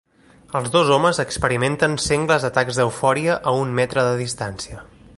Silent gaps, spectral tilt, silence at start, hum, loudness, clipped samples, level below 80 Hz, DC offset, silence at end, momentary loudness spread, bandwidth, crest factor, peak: none; -4.5 dB/octave; 0.5 s; none; -20 LUFS; under 0.1%; -46 dBFS; under 0.1%; 0.3 s; 11 LU; 11.5 kHz; 18 dB; -2 dBFS